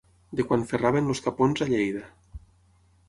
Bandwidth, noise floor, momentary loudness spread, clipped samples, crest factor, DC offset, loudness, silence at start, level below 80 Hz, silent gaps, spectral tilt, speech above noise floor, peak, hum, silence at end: 11.5 kHz; -61 dBFS; 11 LU; under 0.1%; 18 dB; under 0.1%; -26 LUFS; 0.3 s; -52 dBFS; none; -6.5 dB/octave; 36 dB; -8 dBFS; none; 0.7 s